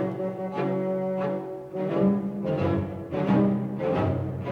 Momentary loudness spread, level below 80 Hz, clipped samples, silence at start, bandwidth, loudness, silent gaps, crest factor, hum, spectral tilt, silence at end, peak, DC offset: 8 LU; -58 dBFS; under 0.1%; 0 s; 5.4 kHz; -27 LUFS; none; 16 dB; none; -10 dB/octave; 0 s; -10 dBFS; under 0.1%